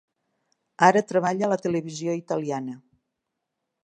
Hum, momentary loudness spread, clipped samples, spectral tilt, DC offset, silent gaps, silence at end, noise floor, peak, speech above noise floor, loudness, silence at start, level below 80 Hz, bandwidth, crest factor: none; 13 LU; under 0.1%; -5.5 dB/octave; under 0.1%; none; 1.05 s; -82 dBFS; -2 dBFS; 59 dB; -24 LUFS; 0.8 s; -72 dBFS; 10.5 kHz; 24 dB